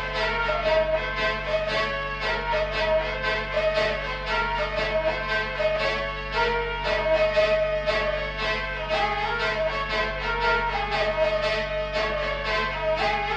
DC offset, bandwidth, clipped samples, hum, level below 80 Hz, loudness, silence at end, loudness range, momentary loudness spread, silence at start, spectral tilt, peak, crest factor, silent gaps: under 0.1%; 8.8 kHz; under 0.1%; none; -38 dBFS; -25 LUFS; 0 s; 1 LU; 4 LU; 0 s; -4.5 dB/octave; -12 dBFS; 14 dB; none